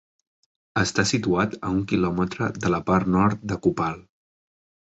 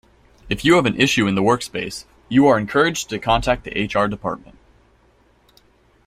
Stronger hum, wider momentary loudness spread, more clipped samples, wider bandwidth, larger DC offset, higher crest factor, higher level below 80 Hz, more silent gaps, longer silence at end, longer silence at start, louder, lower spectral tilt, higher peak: neither; second, 6 LU vs 12 LU; neither; second, 8.2 kHz vs 16 kHz; neither; about the same, 20 dB vs 18 dB; about the same, -46 dBFS vs -42 dBFS; neither; second, 0.95 s vs 1.7 s; first, 0.75 s vs 0.45 s; second, -24 LUFS vs -19 LUFS; about the same, -5.5 dB/octave vs -5 dB/octave; about the same, -4 dBFS vs -2 dBFS